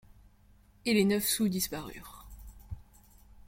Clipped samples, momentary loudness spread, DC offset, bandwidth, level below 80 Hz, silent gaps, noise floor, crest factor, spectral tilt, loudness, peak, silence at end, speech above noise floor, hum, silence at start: under 0.1%; 24 LU; under 0.1%; 16.5 kHz; -54 dBFS; none; -61 dBFS; 20 dB; -4 dB/octave; -29 LUFS; -14 dBFS; 0.65 s; 31 dB; none; 0.85 s